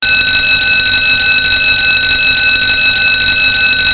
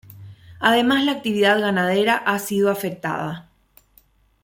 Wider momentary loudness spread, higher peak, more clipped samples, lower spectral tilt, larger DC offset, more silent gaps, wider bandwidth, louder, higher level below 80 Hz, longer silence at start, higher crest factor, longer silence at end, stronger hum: second, 0 LU vs 9 LU; first, 0 dBFS vs -4 dBFS; neither; first, -6 dB/octave vs -4.5 dB/octave; neither; neither; second, 4 kHz vs 17 kHz; first, -7 LUFS vs -20 LUFS; first, -32 dBFS vs -62 dBFS; about the same, 0 s vs 0.1 s; second, 10 dB vs 18 dB; second, 0 s vs 1 s; neither